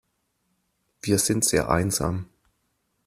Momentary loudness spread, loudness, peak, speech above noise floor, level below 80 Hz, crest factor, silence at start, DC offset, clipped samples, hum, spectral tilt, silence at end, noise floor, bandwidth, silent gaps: 12 LU; -23 LUFS; -4 dBFS; 50 dB; -48 dBFS; 22 dB; 1.05 s; under 0.1%; under 0.1%; none; -4 dB/octave; 0.85 s; -73 dBFS; 15.5 kHz; none